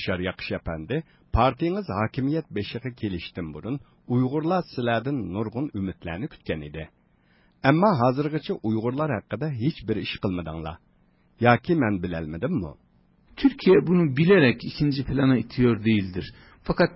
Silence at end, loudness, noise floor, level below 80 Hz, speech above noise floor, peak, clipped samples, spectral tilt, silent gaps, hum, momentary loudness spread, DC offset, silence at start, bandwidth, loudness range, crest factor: 0 s; -25 LUFS; -62 dBFS; -44 dBFS; 38 dB; -4 dBFS; under 0.1%; -11.5 dB/octave; none; none; 14 LU; under 0.1%; 0 s; 5.8 kHz; 6 LU; 20 dB